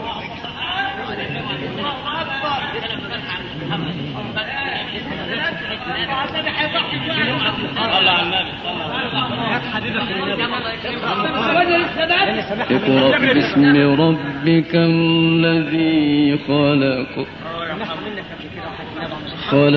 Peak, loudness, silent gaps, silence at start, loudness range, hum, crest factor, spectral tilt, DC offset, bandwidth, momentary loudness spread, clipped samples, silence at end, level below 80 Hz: -2 dBFS; -18 LUFS; none; 0 s; 8 LU; none; 16 dB; -3.5 dB/octave; under 0.1%; 6.2 kHz; 12 LU; under 0.1%; 0 s; -48 dBFS